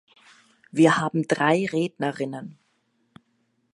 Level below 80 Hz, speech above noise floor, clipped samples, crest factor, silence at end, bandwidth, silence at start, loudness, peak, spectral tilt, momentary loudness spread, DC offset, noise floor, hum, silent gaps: -70 dBFS; 48 dB; under 0.1%; 22 dB; 1.25 s; 11.5 kHz; 0.75 s; -23 LUFS; -4 dBFS; -6 dB/octave; 13 LU; under 0.1%; -70 dBFS; none; none